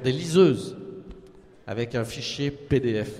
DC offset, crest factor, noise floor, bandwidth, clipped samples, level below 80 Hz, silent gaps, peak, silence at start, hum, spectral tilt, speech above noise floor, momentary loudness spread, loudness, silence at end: under 0.1%; 20 dB; -49 dBFS; 13.5 kHz; under 0.1%; -50 dBFS; none; -6 dBFS; 0 s; none; -6 dB/octave; 25 dB; 21 LU; -25 LUFS; 0 s